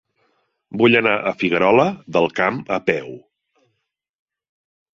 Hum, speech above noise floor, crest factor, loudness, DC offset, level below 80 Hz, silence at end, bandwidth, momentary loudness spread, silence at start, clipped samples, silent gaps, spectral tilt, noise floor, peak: none; 57 dB; 20 dB; -18 LUFS; under 0.1%; -60 dBFS; 1.8 s; 7.4 kHz; 9 LU; 0.7 s; under 0.1%; none; -6.5 dB/octave; -75 dBFS; -2 dBFS